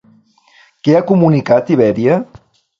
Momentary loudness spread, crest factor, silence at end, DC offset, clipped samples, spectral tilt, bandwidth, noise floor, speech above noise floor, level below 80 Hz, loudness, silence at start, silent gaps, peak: 7 LU; 14 dB; 0.55 s; under 0.1%; under 0.1%; -9 dB/octave; 7.4 kHz; -50 dBFS; 39 dB; -52 dBFS; -13 LUFS; 0.85 s; none; 0 dBFS